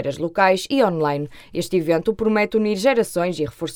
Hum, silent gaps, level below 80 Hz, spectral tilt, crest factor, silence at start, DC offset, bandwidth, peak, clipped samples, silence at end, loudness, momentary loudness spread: none; none; -50 dBFS; -5.5 dB/octave; 16 dB; 0 s; under 0.1%; 18 kHz; -4 dBFS; under 0.1%; 0 s; -20 LUFS; 8 LU